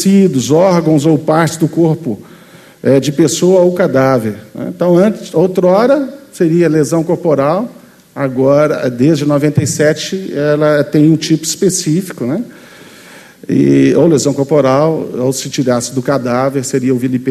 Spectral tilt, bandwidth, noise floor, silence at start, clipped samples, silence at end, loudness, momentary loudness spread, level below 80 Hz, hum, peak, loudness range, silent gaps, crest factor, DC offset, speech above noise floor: -6 dB/octave; 13.5 kHz; -39 dBFS; 0 s; under 0.1%; 0 s; -12 LUFS; 9 LU; -52 dBFS; none; 0 dBFS; 2 LU; none; 12 dB; under 0.1%; 28 dB